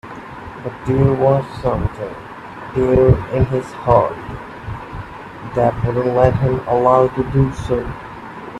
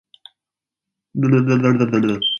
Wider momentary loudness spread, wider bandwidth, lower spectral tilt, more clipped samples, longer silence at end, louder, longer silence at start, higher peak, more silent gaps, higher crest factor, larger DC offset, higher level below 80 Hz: first, 19 LU vs 6 LU; first, 10.5 kHz vs 6.8 kHz; first, -9 dB/octave vs -7 dB/octave; neither; about the same, 0 s vs 0 s; about the same, -17 LUFS vs -17 LUFS; second, 0.05 s vs 1.15 s; first, 0 dBFS vs -4 dBFS; neither; about the same, 18 dB vs 16 dB; neither; first, -34 dBFS vs -58 dBFS